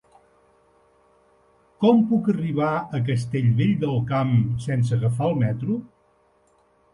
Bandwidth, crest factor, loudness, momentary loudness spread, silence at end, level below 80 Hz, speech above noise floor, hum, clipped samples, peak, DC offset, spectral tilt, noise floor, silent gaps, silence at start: 11 kHz; 16 dB; -22 LUFS; 6 LU; 1.05 s; -54 dBFS; 41 dB; none; under 0.1%; -6 dBFS; under 0.1%; -8.5 dB/octave; -62 dBFS; none; 1.8 s